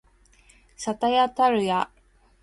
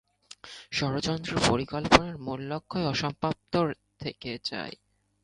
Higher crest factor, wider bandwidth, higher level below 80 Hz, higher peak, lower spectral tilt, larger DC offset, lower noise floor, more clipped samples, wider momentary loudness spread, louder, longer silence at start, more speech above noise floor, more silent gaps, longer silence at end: second, 16 dB vs 30 dB; about the same, 11.5 kHz vs 11.5 kHz; second, -58 dBFS vs -50 dBFS; second, -10 dBFS vs 0 dBFS; about the same, -4.5 dB/octave vs -4.5 dB/octave; neither; first, -57 dBFS vs -50 dBFS; neither; second, 12 LU vs 16 LU; first, -24 LUFS vs -28 LUFS; first, 0.8 s vs 0.45 s; first, 35 dB vs 21 dB; neither; about the same, 0.55 s vs 0.5 s